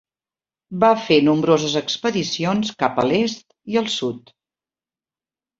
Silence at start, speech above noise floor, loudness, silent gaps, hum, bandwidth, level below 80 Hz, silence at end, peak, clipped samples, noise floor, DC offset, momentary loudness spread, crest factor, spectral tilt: 0.7 s; over 71 dB; -19 LUFS; none; none; 7.8 kHz; -60 dBFS; 1.4 s; -2 dBFS; under 0.1%; under -90 dBFS; under 0.1%; 10 LU; 20 dB; -5 dB/octave